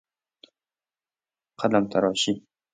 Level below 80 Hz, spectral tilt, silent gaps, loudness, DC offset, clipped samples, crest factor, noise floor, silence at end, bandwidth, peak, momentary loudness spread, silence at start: -66 dBFS; -4.5 dB/octave; none; -24 LUFS; under 0.1%; under 0.1%; 22 dB; under -90 dBFS; 0.35 s; 9.6 kHz; -6 dBFS; 7 LU; 1.6 s